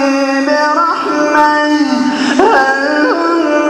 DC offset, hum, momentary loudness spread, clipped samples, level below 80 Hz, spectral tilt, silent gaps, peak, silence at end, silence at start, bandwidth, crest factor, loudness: under 0.1%; none; 4 LU; under 0.1%; -54 dBFS; -3 dB/octave; none; 0 dBFS; 0 s; 0 s; 11.5 kHz; 10 dB; -11 LUFS